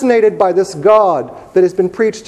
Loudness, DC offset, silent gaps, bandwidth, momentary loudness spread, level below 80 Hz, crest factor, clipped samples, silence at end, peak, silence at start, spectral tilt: -13 LUFS; under 0.1%; none; 11.5 kHz; 6 LU; -54 dBFS; 12 dB; 0.1%; 0.05 s; 0 dBFS; 0 s; -6 dB/octave